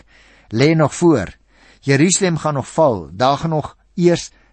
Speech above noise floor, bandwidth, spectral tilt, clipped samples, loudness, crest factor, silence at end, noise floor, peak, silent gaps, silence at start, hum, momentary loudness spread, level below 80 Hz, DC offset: 33 dB; 8.8 kHz; -5 dB/octave; under 0.1%; -16 LUFS; 16 dB; 0.25 s; -49 dBFS; -2 dBFS; none; 0.5 s; none; 10 LU; -48 dBFS; under 0.1%